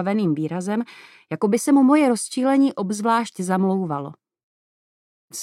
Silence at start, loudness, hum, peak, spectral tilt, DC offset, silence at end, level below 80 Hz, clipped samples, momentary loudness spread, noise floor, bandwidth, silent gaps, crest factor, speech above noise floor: 0 s; -20 LUFS; none; -6 dBFS; -6 dB/octave; under 0.1%; 0 s; -78 dBFS; under 0.1%; 14 LU; under -90 dBFS; 13.5 kHz; 4.43-5.28 s; 16 dB; over 70 dB